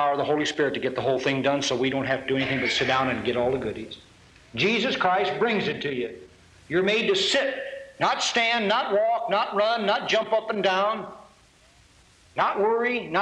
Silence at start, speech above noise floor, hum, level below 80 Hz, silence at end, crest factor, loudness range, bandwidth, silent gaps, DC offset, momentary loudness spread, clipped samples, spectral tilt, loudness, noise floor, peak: 0 s; 32 dB; none; -60 dBFS; 0 s; 14 dB; 3 LU; 11 kHz; none; under 0.1%; 9 LU; under 0.1%; -4 dB/octave; -24 LUFS; -56 dBFS; -10 dBFS